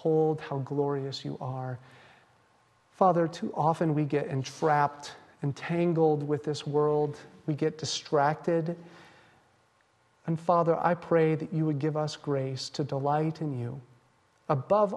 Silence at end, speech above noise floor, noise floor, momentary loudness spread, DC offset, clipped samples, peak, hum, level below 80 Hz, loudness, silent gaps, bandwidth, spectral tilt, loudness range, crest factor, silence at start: 0 s; 39 dB; -67 dBFS; 11 LU; under 0.1%; under 0.1%; -10 dBFS; none; -72 dBFS; -29 LUFS; none; 11 kHz; -6.5 dB/octave; 3 LU; 20 dB; 0 s